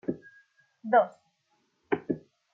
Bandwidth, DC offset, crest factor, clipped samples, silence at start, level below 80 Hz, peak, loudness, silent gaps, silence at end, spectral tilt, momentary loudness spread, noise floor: 4.5 kHz; under 0.1%; 22 dB; under 0.1%; 0.1 s; -72 dBFS; -10 dBFS; -29 LUFS; none; 0.35 s; -8.5 dB/octave; 17 LU; -74 dBFS